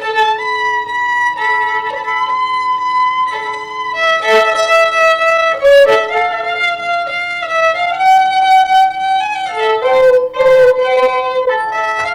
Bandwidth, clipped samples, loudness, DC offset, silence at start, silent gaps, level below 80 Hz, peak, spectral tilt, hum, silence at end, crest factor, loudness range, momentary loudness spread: 16 kHz; under 0.1%; -12 LUFS; under 0.1%; 0 s; none; -50 dBFS; -4 dBFS; -1.5 dB/octave; none; 0 s; 10 dB; 4 LU; 8 LU